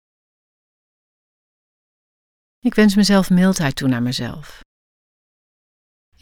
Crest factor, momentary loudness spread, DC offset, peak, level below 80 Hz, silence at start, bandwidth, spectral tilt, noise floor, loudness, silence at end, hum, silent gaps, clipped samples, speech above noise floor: 18 dB; 12 LU; under 0.1%; -2 dBFS; -46 dBFS; 2.65 s; 17 kHz; -5.5 dB/octave; under -90 dBFS; -17 LUFS; 1.7 s; none; none; under 0.1%; over 74 dB